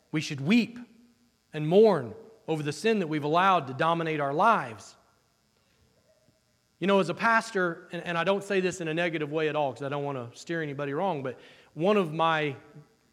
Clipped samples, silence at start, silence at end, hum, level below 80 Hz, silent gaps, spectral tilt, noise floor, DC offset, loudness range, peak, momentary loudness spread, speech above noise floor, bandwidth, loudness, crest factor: under 0.1%; 0.15 s; 0.3 s; none; -76 dBFS; none; -5.5 dB/octave; -69 dBFS; under 0.1%; 4 LU; -10 dBFS; 14 LU; 42 dB; 13.5 kHz; -27 LUFS; 18 dB